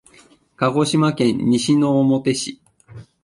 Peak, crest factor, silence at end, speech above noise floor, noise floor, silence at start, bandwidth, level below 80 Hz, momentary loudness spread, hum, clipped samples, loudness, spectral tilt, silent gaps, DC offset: -4 dBFS; 14 dB; 0.2 s; 34 dB; -52 dBFS; 0.6 s; 11.5 kHz; -56 dBFS; 6 LU; none; under 0.1%; -18 LUFS; -5.5 dB/octave; none; under 0.1%